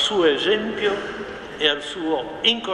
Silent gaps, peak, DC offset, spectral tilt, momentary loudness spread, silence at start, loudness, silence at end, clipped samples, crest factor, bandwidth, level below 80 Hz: none; -4 dBFS; under 0.1%; -3 dB/octave; 12 LU; 0 s; -21 LUFS; 0 s; under 0.1%; 18 dB; 10.5 kHz; -54 dBFS